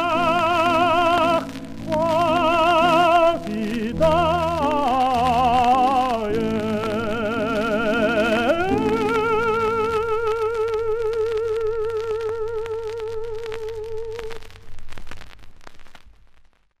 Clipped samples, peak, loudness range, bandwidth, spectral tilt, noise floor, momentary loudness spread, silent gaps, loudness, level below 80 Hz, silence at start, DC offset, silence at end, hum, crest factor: under 0.1%; -6 dBFS; 13 LU; 15.5 kHz; -5.5 dB/octave; -51 dBFS; 13 LU; none; -20 LUFS; -42 dBFS; 0 s; under 0.1%; 0.7 s; none; 16 dB